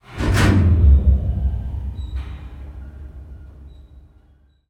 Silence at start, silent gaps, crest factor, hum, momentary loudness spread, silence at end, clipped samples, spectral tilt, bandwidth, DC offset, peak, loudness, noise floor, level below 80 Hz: 0.1 s; none; 16 dB; none; 24 LU; 1 s; under 0.1%; -7 dB/octave; 11.5 kHz; under 0.1%; -4 dBFS; -18 LUFS; -54 dBFS; -22 dBFS